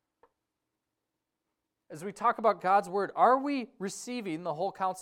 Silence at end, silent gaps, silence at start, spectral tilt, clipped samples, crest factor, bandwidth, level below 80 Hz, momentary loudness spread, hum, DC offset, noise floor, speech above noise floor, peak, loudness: 0 s; none; 1.9 s; -5 dB/octave; under 0.1%; 20 dB; 15.5 kHz; -80 dBFS; 13 LU; none; under 0.1%; -86 dBFS; 57 dB; -12 dBFS; -29 LUFS